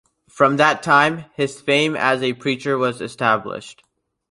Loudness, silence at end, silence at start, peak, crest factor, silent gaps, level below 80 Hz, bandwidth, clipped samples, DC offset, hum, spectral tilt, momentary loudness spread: -18 LUFS; 0.6 s; 0.35 s; -2 dBFS; 18 dB; none; -62 dBFS; 11.5 kHz; under 0.1%; under 0.1%; none; -4.5 dB/octave; 9 LU